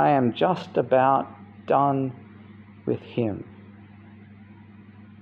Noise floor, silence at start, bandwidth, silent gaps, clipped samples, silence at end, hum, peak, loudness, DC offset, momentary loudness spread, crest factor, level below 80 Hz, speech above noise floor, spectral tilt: -47 dBFS; 0 s; 7.2 kHz; none; under 0.1%; 0.15 s; none; -6 dBFS; -24 LUFS; under 0.1%; 18 LU; 18 dB; -68 dBFS; 25 dB; -9 dB/octave